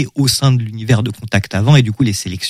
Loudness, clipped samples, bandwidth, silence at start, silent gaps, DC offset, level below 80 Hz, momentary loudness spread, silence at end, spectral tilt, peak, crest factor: -14 LUFS; under 0.1%; 16 kHz; 0 s; none; under 0.1%; -42 dBFS; 6 LU; 0 s; -5 dB/octave; 0 dBFS; 14 dB